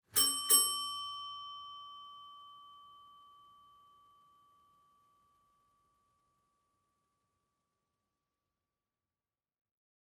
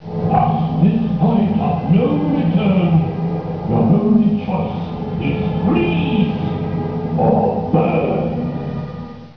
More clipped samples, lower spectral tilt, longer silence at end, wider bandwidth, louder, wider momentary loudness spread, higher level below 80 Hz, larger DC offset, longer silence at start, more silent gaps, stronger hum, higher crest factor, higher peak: neither; second, 1.5 dB/octave vs -10.5 dB/octave; first, 7.05 s vs 0.05 s; first, 19 kHz vs 5.4 kHz; second, -30 LUFS vs -17 LUFS; first, 27 LU vs 8 LU; second, -80 dBFS vs -40 dBFS; second, under 0.1% vs 0.3%; first, 0.15 s vs 0 s; neither; neither; first, 28 dB vs 14 dB; second, -14 dBFS vs -2 dBFS